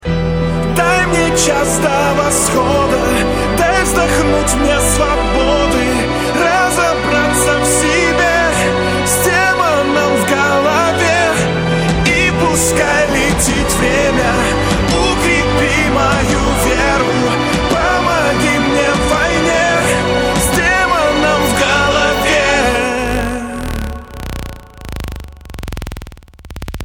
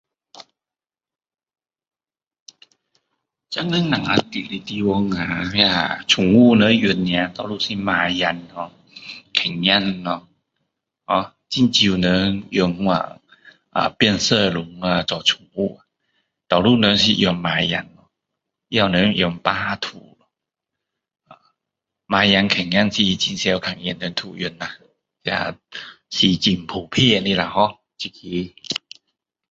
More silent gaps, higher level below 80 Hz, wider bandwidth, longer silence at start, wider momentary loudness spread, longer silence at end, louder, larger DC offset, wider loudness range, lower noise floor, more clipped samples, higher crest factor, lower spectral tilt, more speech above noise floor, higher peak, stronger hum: second, none vs 2.40-2.46 s; first, -26 dBFS vs -50 dBFS; first, 19.5 kHz vs 8 kHz; second, 0 s vs 0.35 s; second, 10 LU vs 13 LU; second, 0 s vs 0.75 s; first, -12 LUFS vs -19 LUFS; neither; second, 2 LU vs 6 LU; second, -34 dBFS vs under -90 dBFS; neither; second, 12 dB vs 20 dB; about the same, -4 dB/octave vs -4.5 dB/octave; second, 21 dB vs over 71 dB; about the same, -2 dBFS vs 0 dBFS; neither